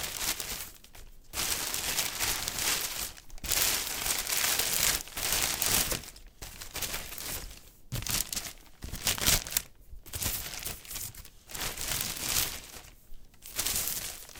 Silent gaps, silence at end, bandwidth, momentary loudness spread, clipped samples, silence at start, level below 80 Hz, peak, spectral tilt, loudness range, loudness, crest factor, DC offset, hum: none; 0 s; 19 kHz; 17 LU; under 0.1%; 0 s; -48 dBFS; -4 dBFS; -0.5 dB/octave; 6 LU; -30 LUFS; 30 dB; under 0.1%; none